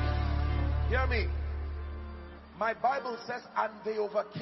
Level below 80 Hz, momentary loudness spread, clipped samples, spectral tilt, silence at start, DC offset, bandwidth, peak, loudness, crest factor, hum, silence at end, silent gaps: -36 dBFS; 12 LU; under 0.1%; -8 dB/octave; 0 s; under 0.1%; 6 kHz; -16 dBFS; -33 LUFS; 16 dB; none; 0 s; none